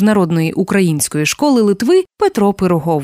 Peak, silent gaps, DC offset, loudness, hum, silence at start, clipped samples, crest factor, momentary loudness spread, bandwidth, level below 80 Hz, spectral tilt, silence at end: -2 dBFS; none; under 0.1%; -14 LUFS; none; 0 s; under 0.1%; 10 dB; 3 LU; 16 kHz; -48 dBFS; -5.5 dB/octave; 0 s